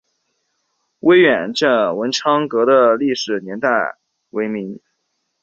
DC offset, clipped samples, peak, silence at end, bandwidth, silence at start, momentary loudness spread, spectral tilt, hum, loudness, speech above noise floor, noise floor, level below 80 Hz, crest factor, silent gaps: under 0.1%; under 0.1%; -2 dBFS; 0.65 s; 8 kHz; 1.05 s; 14 LU; -4.5 dB/octave; none; -16 LUFS; 55 dB; -71 dBFS; -64 dBFS; 16 dB; none